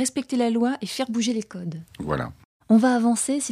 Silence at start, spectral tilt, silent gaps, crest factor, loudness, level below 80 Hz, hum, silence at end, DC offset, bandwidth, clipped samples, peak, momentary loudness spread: 0 s; -4.5 dB/octave; 2.45-2.60 s; 16 dB; -23 LUFS; -54 dBFS; none; 0 s; under 0.1%; 14 kHz; under 0.1%; -8 dBFS; 15 LU